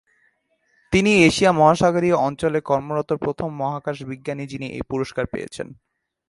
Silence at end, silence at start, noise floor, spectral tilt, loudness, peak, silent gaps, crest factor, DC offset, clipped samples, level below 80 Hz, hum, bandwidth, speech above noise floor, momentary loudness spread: 0.55 s; 0.9 s; -66 dBFS; -5.5 dB/octave; -20 LUFS; -2 dBFS; none; 20 dB; under 0.1%; under 0.1%; -48 dBFS; none; 11.5 kHz; 46 dB; 15 LU